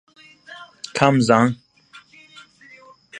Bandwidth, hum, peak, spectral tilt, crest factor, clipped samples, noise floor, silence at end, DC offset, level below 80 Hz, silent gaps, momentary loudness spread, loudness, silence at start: 11 kHz; none; 0 dBFS; -6 dB/octave; 22 dB; under 0.1%; -49 dBFS; 0 s; under 0.1%; -62 dBFS; none; 25 LU; -18 LUFS; 0.5 s